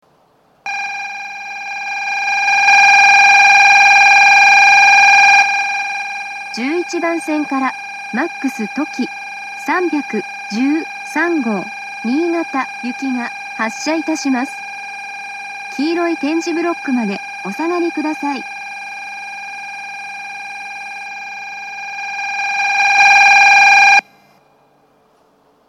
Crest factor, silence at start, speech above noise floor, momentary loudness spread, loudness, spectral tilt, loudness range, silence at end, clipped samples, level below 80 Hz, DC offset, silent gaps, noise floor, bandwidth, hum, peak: 14 dB; 0.65 s; 36 dB; 20 LU; -12 LUFS; -2 dB/octave; 15 LU; 1.7 s; under 0.1%; -74 dBFS; under 0.1%; none; -54 dBFS; 13.5 kHz; none; 0 dBFS